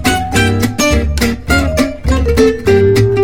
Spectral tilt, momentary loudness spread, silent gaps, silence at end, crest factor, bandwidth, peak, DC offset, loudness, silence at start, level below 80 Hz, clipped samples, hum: -5.5 dB/octave; 5 LU; none; 0 s; 12 dB; 17.5 kHz; 0 dBFS; 2%; -12 LUFS; 0 s; -20 dBFS; under 0.1%; none